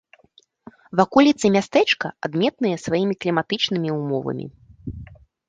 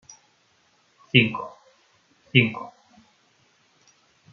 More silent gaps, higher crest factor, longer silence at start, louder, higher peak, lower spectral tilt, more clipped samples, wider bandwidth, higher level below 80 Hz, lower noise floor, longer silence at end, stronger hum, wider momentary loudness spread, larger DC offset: neither; second, 20 dB vs 26 dB; second, 0.95 s vs 1.15 s; about the same, -20 LUFS vs -21 LUFS; about the same, -2 dBFS vs -2 dBFS; about the same, -5.5 dB/octave vs -6 dB/octave; neither; first, 9.4 kHz vs 7 kHz; first, -52 dBFS vs -66 dBFS; second, -57 dBFS vs -64 dBFS; second, 0.45 s vs 1.65 s; neither; about the same, 20 LU vs 20 LU; neither